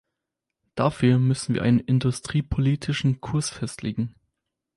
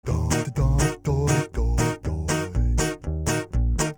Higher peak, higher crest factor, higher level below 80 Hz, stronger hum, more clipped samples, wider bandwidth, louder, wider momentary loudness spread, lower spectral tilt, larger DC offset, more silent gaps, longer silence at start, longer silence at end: about the same, -8 dBFS vs -8 dBFS; about the same, 16 dB vs 14 dB; second, -46 dBFS vs -28 dBFS; neither; neither; second, 11.5 kHz vs 19.5 kHz; about the same, -24 LUFS vs -24 LUFS; first, 10 LU vs 4 LU; about the same, -6.5 dB/octave vs -5.5 dB/octave; neither; neither; first, 0.75 s vs 0.05 s; first, 0.7 s vs 0.05 s